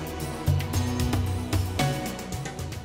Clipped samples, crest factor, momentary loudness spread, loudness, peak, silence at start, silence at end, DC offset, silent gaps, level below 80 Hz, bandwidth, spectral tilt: under 0.1%; 16 dB; 7 LU; -28 LUFS; -12 dBFS; 0 s; 0 s; under 0.1%; none; -38 dBFS; 16 kHz; -5.5 dB/octave